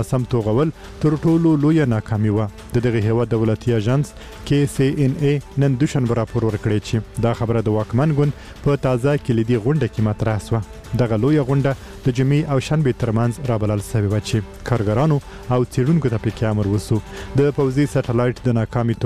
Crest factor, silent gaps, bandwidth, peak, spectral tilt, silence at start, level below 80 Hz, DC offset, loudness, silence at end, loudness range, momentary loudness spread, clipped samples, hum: 16 dB; none; 13.5 kHz; -4 dBFS; -7.5 dB/octave; 0 s; -40 dBFS; 0.4%; -19 LUFS; 0 s; 2 LU; 6 LU; under 0.1%; none